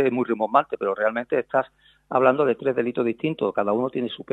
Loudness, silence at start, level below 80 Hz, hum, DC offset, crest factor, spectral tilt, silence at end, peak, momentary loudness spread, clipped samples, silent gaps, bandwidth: -23 LUFS; 0 s; -68 dBFS; none; under 0.1%; 20 dB; -8 dB/octave; 0.1 s; -2 dBFS; 7 LU; under 0.1%; none; 7.8 kHz